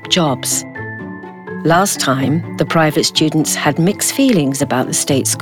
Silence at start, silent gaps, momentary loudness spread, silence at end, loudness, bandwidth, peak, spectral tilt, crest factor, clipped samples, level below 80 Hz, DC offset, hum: 0 s; none; 14 LU; 0 s; -14 LUFS; 19 kHz; 0 dBFS; -4 dB/octave; 14 dB; under 0.1%; -54 dBFS; under 0.1%; none